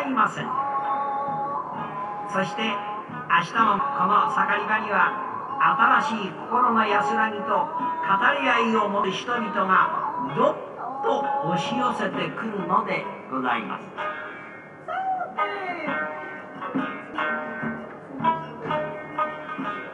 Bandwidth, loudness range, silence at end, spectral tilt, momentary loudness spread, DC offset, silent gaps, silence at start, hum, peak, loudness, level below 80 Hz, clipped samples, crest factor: 11 kHz; 7 LU; 0 s; -5 dB/octave; 11 LU; under 0.1%; none; 0 s; none; -4 dBFS; -24 LUFS; -72 dBFS; under 0.1%; 20 dB